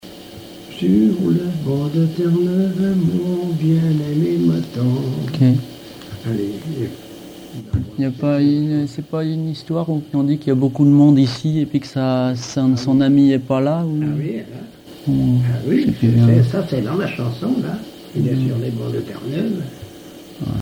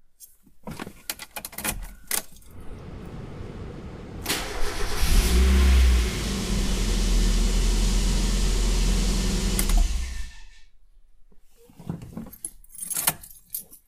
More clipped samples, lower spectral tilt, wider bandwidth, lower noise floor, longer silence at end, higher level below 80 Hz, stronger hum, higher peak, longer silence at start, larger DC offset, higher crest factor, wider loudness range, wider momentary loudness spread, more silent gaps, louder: neither; first, -8 dB/octave vs -4 dB/octave; about the same, 16.5 kHz vs 16 kHz; second, -38 dBFS vs -51 dBFS; about the same, 0 s vs 0.1 s; second, -48 dBFS vs -26 dBFS; neither; about the same, -2 dBFS vs -4 dBFS; second, 0.05 s vs 0.2 s; neither; second, 14 dB vs 22 dB; second, 6 LU vs 10 LU; about the same, 17 LU vs 18 LU; neither; first, -18 LUFS vs -26 LUFS